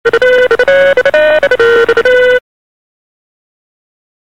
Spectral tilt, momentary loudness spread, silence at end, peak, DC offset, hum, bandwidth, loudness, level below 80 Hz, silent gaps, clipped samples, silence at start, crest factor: -3.5 dB/octave; 1 LU; 1.9 s; 0 dBFS; 2%; none; 11 kHz; -8 LUFS; -42 dBFS; none; under 0.1%; 0.05 s; 10 dB